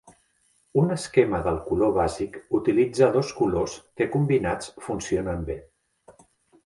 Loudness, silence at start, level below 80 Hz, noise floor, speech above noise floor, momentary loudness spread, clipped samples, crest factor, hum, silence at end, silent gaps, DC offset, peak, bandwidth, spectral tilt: -25 LUFS; 0.05 s; -46 dBFS; -66 dBFS; 43 dB; 11 LU; under 0.1%; 20 dB; none; 0.55 s; none; under 0.1%; -4 dBFS; 11.5 kHz; -6.5 dB/octave